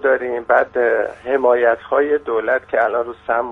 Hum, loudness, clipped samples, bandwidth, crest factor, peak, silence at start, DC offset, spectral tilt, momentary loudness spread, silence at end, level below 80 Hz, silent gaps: 50 Hz at -60 dBFS; -18 LUFS; under 0.1%; 4 kHz; 16 dB; -2 dBFS; 0 s; under 0.1%; -6.5 dB/octave; 6 LU; 0 s; -54 dBFS; none